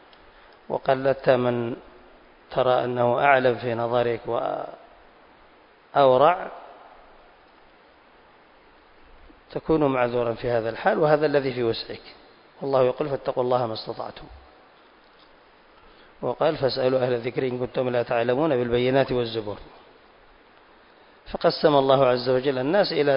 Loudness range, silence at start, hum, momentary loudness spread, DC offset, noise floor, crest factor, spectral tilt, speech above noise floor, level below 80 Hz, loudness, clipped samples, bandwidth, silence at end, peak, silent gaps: 6 LU; 0.7 s; none; 15 LU; under 0.1%; -54 dBFS; 22 dB; -10.5 dB/octave; 32 dB; -56 dBFS; -23 LUFS; under 0.1%; 5.4 kHz; 0 s; -4 dBFS; none